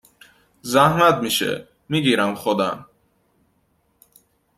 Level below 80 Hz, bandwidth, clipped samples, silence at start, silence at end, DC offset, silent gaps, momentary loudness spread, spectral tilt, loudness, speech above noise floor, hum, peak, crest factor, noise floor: -58 dBFS; 16 kHz; under 0.1%; 0.65 s; 1.75 s; under 0.1%; none; 14 LU; -4.5 dB/octave; -19 LUFS; 46 dB; none; -2 dBFS; 20 dB; -65 dBFS